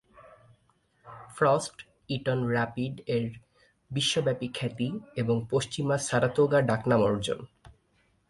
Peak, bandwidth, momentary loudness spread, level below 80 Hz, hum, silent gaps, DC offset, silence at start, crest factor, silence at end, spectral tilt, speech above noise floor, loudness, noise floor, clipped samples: -10 dBFS; 11.5 kHz; 12 LU; -60 dBFS; none; none; under 0.1%; 0.2 s; 18 dB; 0.6 s; -5 dB/octave; 41 dB; -28 LUFS; -69 dBFS; under 0.1%